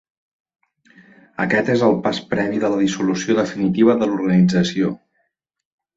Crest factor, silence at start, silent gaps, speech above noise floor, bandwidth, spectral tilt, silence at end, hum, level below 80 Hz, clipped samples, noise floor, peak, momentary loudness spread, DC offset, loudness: 16 dB; 1.4 s; none; 54 dB; 7.8 kHz; -6 dB/octave; 1 s; none; -56 dBFS; under 0.1%; -71 dBFS; -2 dBFS; 7 LU; under 0.1%; -18 LUFS